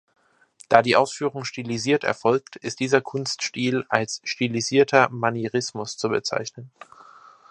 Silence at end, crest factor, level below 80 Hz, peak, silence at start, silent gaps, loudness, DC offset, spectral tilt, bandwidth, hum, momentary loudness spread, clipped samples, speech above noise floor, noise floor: 0.85 s; 24 dB; -66 dBFS; 0 dBFS; 0.7 s; none; -23 LUFS; under 0.1%; -4 dB/octave; 11 kHz; none; 11 LU; under 0.1%; 31 dB; -54 dBFS